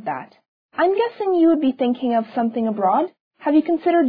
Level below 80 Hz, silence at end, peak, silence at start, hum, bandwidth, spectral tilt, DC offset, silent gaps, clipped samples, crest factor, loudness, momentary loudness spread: -68 dBFS; 0 s; -6 dBFS; 0 s; none; 4.9 kHz; -9.5 dB/octave; under 0.1%; 0.48-0.69 s, 3.20-3.31 s; under 0.1%; 12 dB; -20 LUFS; 11 LU